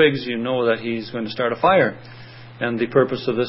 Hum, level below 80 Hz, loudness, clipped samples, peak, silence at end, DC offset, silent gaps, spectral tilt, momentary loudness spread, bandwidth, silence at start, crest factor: none; -60 dBFS; -21 LUFS; under 0.1%; -2 dBFS; 0 s; under 0.1%; none; -10.5 dB/octave; 22 LU; 5.8 kHz; 0 s; 18 dB